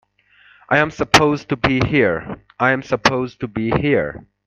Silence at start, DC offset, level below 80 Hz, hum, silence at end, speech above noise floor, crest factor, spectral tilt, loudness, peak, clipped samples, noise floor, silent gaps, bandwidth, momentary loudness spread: 0.7 s; under 0.1%; -42 dBFS; none; 0.25 s; 35 dB; 18 dB; -5 dB/octave; -18 LUFS; 0 dBFS; under 0.1%; -53 dBFS; none; 15.5 kHz; 11 LU